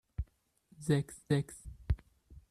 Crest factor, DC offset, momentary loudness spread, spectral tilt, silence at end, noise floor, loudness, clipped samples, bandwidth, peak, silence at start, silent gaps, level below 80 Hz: 18 dB; under 0.1%; 13 LU; -6.5 dB/octave; 0.1 s; -68 dBFS; -36 LUFS; under 0.1%; 13 kHz; -18 dBFS; 0.2 s; none; -46 dBFS